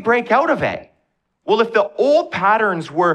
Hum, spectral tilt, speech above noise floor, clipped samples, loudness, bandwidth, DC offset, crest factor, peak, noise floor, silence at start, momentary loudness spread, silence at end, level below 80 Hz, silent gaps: none; -6 dB/octave; 52 dB; under 0.1%; -17 LUFS; 9.6 kHz; under 0.1%; 14 dB; -4 dBFS; -68 dBFS; 0 s; 7 LU; 0 s; -58 dBFS; none